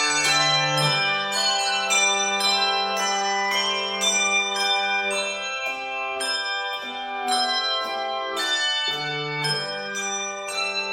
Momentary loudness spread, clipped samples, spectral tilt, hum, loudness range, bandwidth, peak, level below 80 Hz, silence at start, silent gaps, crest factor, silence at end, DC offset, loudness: 8 LU; under 0.1%; -1 dB/octave; none; 4 LU; 16 kHz; -8 dBFS; -66 dBFS; 0 s; none; 16 dB; 0 s; under 0.1%; -22 LUFS